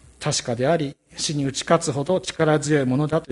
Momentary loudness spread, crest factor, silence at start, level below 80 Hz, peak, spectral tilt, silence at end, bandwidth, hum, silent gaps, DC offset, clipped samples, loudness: 5 LU; 18 dB; 0.2 s; -54 dBFS; -4 dBFS; -5 dB/octave; 0.05 s; 11.5 kHz; none; none; under 0.1%; under 0.1%; -22 LUFS